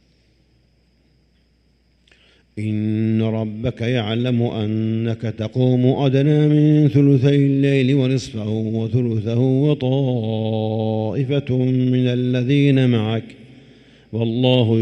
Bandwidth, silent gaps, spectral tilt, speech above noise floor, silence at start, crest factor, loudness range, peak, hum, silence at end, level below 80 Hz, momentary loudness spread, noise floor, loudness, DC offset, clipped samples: 8.6 kHz; none; -8.5 dB/octave; 42 dB; 2.55 s; 16 dB; 8 LU; -2 dBFS; none; 0 s; -54 dBFS; 9 LU; -59 dBFS; -18 LUFS; under 0.1%; under 0.1%